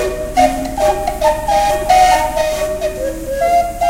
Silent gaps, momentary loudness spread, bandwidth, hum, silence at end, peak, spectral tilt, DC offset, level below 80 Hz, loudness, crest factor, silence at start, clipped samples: none; 9 LU; 16 kHz; none; 0 s; 0 dBFS; -3.5 dB/octave; under 0.1%; -30 dBFS; -15 LUFS; 14 dB; 0 s; under 0.1%